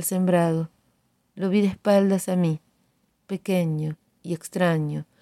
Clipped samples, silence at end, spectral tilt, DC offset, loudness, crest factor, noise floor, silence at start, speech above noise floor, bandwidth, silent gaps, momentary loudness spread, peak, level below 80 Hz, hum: under 0.1%; 0.2 s; -6.5 dB/octave; under 0.1%; -24 LUFS; 16 dB; -68 dBFS; 0 s; 45 dB; 14 kHz; none; 13 LU; -8 dBFS; -64 dBFS; none